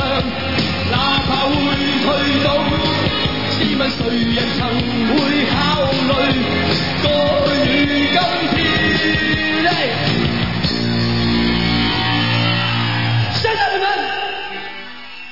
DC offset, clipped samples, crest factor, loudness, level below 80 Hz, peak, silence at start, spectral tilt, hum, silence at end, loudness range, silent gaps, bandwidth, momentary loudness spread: 2%; under 0.1%; 14 dB; -16 LUFS; -36 dBFS; -2 dBFS; 0 s; -6 dB/octave; none; 0 s; 1 LU; none; 5.8 kHz; 4 LU